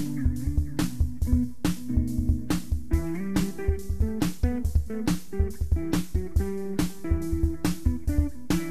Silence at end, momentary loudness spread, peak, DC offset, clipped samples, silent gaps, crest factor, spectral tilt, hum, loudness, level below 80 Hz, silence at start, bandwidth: 0 s; 3 LU; -10 dBFS; 2%; under 0.1%; none; 16 dB; -6.5 dB/octave; none; -28 LUFS; -30 dBFS; 0 s; 14 kHz